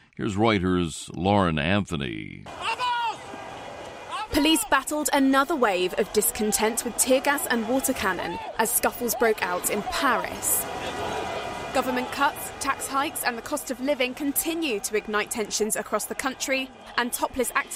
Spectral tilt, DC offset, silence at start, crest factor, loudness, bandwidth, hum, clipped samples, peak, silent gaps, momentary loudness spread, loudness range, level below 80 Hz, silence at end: -3 dB/octave; under 0.1%; 0.15 s; 20 dB; -25 LUFS; 16 kHz; none; under 0.1%; -6 dBFS; none; 9 LU; 4 LU; -50 dBFS; 0 s